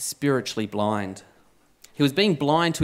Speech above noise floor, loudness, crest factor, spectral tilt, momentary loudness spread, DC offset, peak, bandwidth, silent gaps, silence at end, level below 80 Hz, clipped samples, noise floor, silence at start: 35 dB; -23 LUFS; 18 dB; -5 dB/octave; 15 LU; under 0.1%; -6 dBFS; 16 kHz; none; 0 s; -68 dBFS; under 0.1%; -59 dBFS; 0 s